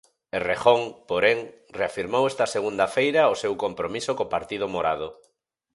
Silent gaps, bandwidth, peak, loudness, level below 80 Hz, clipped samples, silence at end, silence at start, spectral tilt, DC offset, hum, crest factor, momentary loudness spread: none; 11.5 kHz; -2 dBFS; -24 LUFS; -58 dBFS; under 0.1%; 0.6 s; 0.35 s; -4 dB/octave; under 0.1%; none; 22 dB; 9 LU